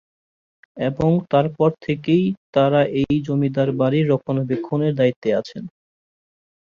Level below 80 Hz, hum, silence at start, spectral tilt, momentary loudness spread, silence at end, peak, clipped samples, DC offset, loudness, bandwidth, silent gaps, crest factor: -52 dBFS; none; 0.75 s; -9 dB/octave; 8 LU; 1.05 s; -4 dBFS; under 0.1%; under 0.1%; -20 LUFS; 7 kHz; 2.37-2.53 s, 5.16-5.22 s; 16 dB